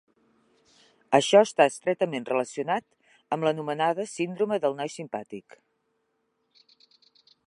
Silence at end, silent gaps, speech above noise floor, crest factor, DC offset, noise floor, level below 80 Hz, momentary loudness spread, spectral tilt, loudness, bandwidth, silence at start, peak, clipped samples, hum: 2.05 s; none; 50 dB; 24 dB; under 0.1%; -75 dBFS; -80 dBFS; 16 LU; -4.5 dB/octave; -26 LUFS; 11.5 kHz; 1.1 s; -4 dBFS; under 0.1%; none